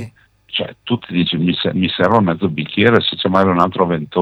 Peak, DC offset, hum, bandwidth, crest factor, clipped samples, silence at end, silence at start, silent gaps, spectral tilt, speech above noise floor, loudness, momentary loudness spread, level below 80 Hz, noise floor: 0 dBFS; under 0.1%; none; 7.4 kHz; 16 dB; under 0.1%; 0 s; 0 s; none; -7.5 dB/octave; 23 dB; -16 LUFS; 9 LU; -52 dBFS; -39 dBFS